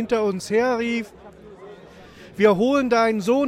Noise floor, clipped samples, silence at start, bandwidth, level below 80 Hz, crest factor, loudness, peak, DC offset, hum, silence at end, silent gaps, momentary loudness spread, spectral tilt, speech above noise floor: -44 dBFS; under 0.1%; 0 s; 14.5 kHz; -56 dBFS; 16 dB; -20 LUFS; -6 dBFS; under 0.1%; none; 0 s; none; 10 LU; -5.5 dB/octave; 25 dB